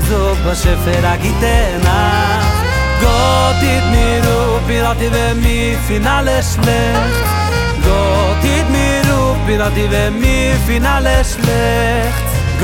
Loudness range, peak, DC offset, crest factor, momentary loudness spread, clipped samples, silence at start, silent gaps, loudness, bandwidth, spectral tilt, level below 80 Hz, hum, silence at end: 1 LU; 0 dBFS; under 0.1%; 12 dB; 2 LU; under 0.1%; 0 s; none; -13 LUFS; 17 kHz; -5 dB/octave; -18 dBFS; none; 0 s